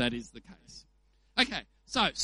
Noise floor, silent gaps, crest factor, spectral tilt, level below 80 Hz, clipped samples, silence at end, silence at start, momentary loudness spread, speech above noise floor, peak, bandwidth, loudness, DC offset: -66 dBFS; none; 24 dB; -2.5 dB/octave; -56 dBFS; under 0.1%; 0 s; 0 s; 23 LU; 33 dB; -8 dBFS; 11.5 kHz; -31 LUFS; under 0.1%